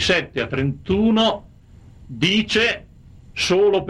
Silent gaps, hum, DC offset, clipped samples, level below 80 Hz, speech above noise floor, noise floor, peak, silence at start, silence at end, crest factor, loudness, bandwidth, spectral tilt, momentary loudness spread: none; none; under 0.1%; under 0.1%; -44 dBFS; 27 dB; -46 dBFS; -4 dBFS; 0 s; 0 s; 16 dB; -19 LUFS; 12 kHz; -4.5 dB/octave; 14 LU